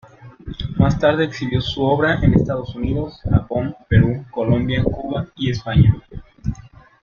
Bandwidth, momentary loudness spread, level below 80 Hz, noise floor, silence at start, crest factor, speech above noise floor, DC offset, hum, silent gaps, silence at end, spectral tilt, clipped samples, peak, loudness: 7 kHz; 14 LU; -32 dBFS; -40 dBFS; 0.2 s; 16 dB; 23 dB; under 0.1%; none; none; 0.35 s; -8 dB/octave; under 0.1%; -2 dBFS; -19 LUFS